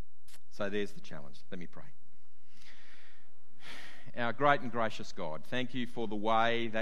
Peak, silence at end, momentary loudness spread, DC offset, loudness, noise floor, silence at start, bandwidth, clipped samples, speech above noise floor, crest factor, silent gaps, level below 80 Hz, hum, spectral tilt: -10 dBFS; 0 s; 21 LU; 3%; -34 LUFS; -70 dBFS; 0.35 s; 13 kHz; under 0.1%; 36 dB; 26 dB; none; -70 dBFS; none; -5.5 dB/octave